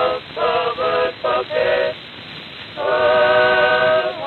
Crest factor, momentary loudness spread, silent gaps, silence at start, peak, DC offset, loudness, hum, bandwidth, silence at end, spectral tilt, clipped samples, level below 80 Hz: 14 dB; 18 LU; none; 0 s; -4 dBFS; under 0.1%; -17 LUFS; none; 4.5 kHz; 0 s; -5.5 dB/octave; under 0.1%; -52 dBFS